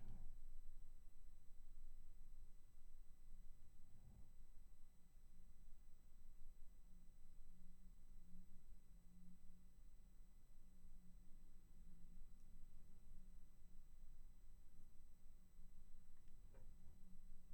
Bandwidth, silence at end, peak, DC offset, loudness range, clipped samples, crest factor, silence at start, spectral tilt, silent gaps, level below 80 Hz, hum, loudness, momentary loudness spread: 8.4 kHz; 0 s; -40 dBFS; under 0.1%; 2 LU; under 0.1%; 12 dB; 0 s; -6 dB/octave; none; -58 dBFS; none; -68 LUFS; 5 LU